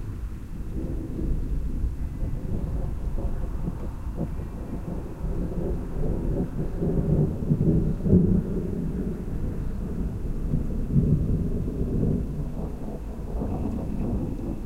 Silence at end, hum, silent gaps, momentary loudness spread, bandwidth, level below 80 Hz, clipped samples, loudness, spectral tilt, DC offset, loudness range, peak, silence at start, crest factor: 0 s; none; none; 11 LU; 13 kHz; -30 dBFS; under 0.1%; -29 LUFS; -10 dB/octave; 0.7%; 7 LU; -6 dBFS; 0 s; 20 dB